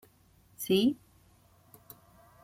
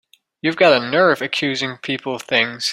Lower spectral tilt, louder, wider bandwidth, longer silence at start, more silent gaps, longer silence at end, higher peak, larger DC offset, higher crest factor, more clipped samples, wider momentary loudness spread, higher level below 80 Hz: about the same, -5 dB/octave vs -4 dB/octave; second, -29 LUFS vs -18 LUFS; about the same, 16 kHz vs 15.5 kHz; first, 0.6 s vs 0.45 s; neither; first, 1.5 s vs 0 s; second, -16 dBFS vs 0 dBFS; neither; about the same, 20 dB vs 18 dB; neither; first, 26 LU vs 10 LU; about the same, -68 dBFS vs -64 dBFS